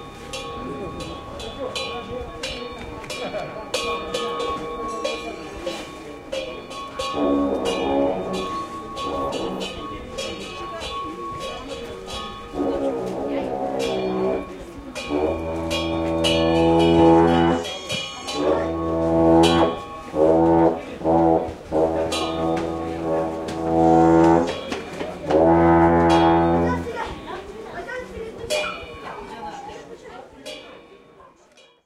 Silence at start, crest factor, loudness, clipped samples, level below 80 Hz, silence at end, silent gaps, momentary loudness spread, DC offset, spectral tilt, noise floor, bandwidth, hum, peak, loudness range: 0 s; 18 dB; -22 LUFS; under 0.1%; -42 dBFS; 0.6 s; none; 18 LU; under 0.1%; -5.5 dB/octave; -53 dBFS; 12.5 kHz; none; -4 dBFS; 12 LU